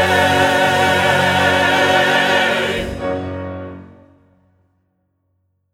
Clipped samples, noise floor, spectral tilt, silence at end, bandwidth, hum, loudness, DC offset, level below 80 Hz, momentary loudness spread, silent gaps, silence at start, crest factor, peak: under 0.1%; -66 dBFS; -4 dB/octave; 1.9 s; 17 kHz; none; -14 LUFS; under 0.1%; -44 dBFS; 14 LU; none; 0 s; 16 dB; -2 dBFS